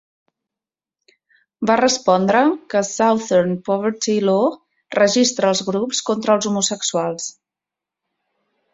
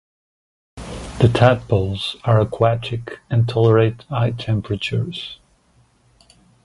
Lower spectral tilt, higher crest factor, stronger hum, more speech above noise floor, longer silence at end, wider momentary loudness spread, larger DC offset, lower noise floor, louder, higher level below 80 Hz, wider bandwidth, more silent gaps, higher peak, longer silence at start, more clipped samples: second, -3.5 dB/octave vs -7.5 dB/octave; about the same, 18 dB vs 20 dB; neither; first, 71 dB vs 40 dB; first, 1.45 s vs 1.3 s; second, 7 LU vs 16 LU; neither; first, -88 dBFS vs -57 dBFS; about the same, -18 LUFS vs -19 LUFS; second, -62 dBFS vs -42 dBFS; second, 8 kHz vs 11.5 kHz; neither; about the same, -2 dBFS vs 0 dBFS; first, 1.6 s vs 0.75 s; neither